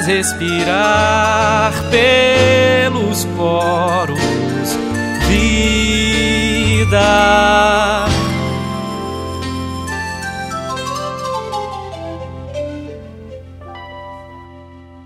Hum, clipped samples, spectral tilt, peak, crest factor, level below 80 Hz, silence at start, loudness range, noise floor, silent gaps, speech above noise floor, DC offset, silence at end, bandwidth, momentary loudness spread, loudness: none; under 0.1%; -4.5 dB/octave; 0 dBFS; 14 dB; -30 dBFS; 0 s; 13 LU; -37 dBFS; none; 25 dB; under 0.1%; 0 s; 16 kHz; 19 LU; -14 LUFS